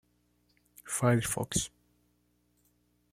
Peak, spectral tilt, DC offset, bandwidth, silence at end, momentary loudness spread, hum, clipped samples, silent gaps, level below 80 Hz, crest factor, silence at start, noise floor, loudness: -12 dBFS; -4.5 dB/octave; under 0.1%; 16 kHz; 1.45 s; 9 LU; 60 Hz at -50 dBFS; under 0.1%; none; -60 dBFS; 24 dB; 0.85 s; -73 dBFS; -31 LUFS